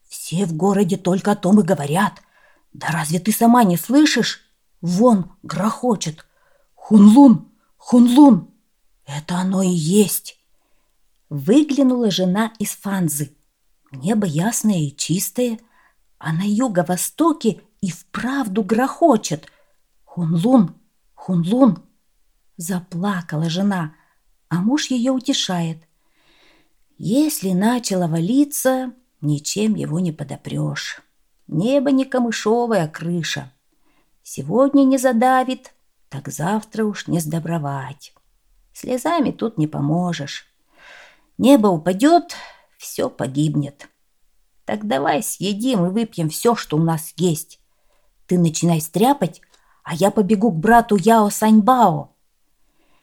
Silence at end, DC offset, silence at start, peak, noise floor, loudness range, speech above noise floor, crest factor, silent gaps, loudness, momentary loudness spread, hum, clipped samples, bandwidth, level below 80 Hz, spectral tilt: 1 s; under 0.1%; 0.1 s; 0 dBFS; -65 dBFS; 7 LU; 47 dB; 18 dB; none; -18 LUFS; 14 LU; none; under 0.1%; 18.5 kHz; -56 dBFS; -5.5 dB/octave